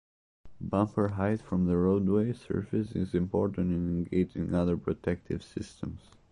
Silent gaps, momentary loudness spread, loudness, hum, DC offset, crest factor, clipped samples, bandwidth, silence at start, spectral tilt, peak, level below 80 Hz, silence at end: none; 12 LU; -30 LUFS; none; under 0.1%; 16 dB; under 0.1%; 10.5 kHz; 0.45 s; -9 dB/octave; -14 dBFS; -48 dBFS; 0.35 s